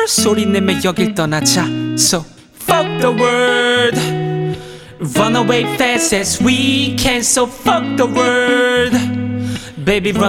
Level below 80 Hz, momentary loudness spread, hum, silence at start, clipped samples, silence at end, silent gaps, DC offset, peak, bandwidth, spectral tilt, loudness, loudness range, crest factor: -40 dBFS; 8 LU; none; 0 s; under 0.1%; 0 s; none; under 0.1%; 0 dBFS; 18 kHz; -3.5 dB/octave; -14 LUFS; 2 LU; 14 dB